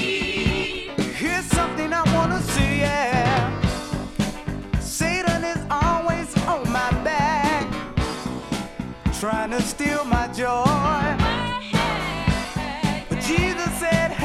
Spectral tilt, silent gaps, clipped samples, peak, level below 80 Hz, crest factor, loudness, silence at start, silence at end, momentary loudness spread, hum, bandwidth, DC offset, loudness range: -5 dB/octave; none; under 0.1%; -4 dBFS; -34 dBFS; 18 dB; -23 LUFS; 0 s; 0 s; 7 LU; none; 16 kHz; under 0.1%; 2 LU